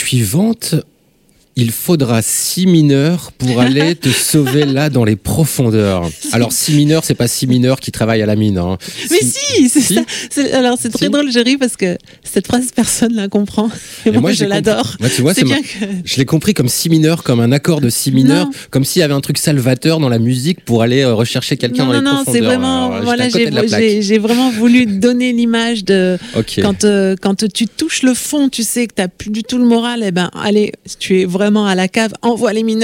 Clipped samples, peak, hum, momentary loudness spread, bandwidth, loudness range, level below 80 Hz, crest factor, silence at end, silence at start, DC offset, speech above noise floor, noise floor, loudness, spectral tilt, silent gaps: under 0.1%; 0 dBFS; none; 6 LU; 16.5 kHz; 2 LU; -46 dBFS; 12 dB; 0 s; 0 s; under 0.1%; 39 dB; -52 dBFS; -13 LUFS; -5 dB/octave; none